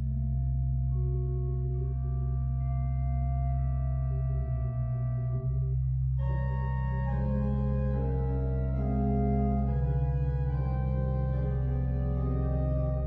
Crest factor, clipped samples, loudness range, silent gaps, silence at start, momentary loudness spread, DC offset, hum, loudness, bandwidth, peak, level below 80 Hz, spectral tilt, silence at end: 10 dB; under 0.1%; 2 LU; none; 0 s; 3 LU; under 0.1%; none; -30 LUFS; 2.9 kHz; -18 dBFS; -32 dBFS; -12.5 dB/octave; 0 s